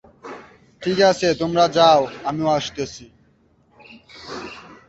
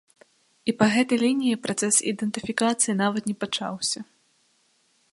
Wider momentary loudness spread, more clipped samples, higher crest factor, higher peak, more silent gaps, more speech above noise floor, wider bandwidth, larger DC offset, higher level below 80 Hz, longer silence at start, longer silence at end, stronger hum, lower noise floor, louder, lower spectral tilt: first, 24 LU vs 8 LU; neither; about the same, 20 dB vs 22 dB; about the same, -2 dBFS vs -4 dBFS; neither; about the same, 40 dB vs 42 dB; second, 8.2 kHz vs 11.5 kHz; neither; first, -54 dBFS vs -68 dBFS; second, 0.25 s vs 0.65 s; second, 0.15 s vs 1.1 s; neither; second, -58 dBFS vs -66 dBFS; first, -18 LUFS vs -24 LUFS; first, -4.5 dB/octave vs -3 dB/octave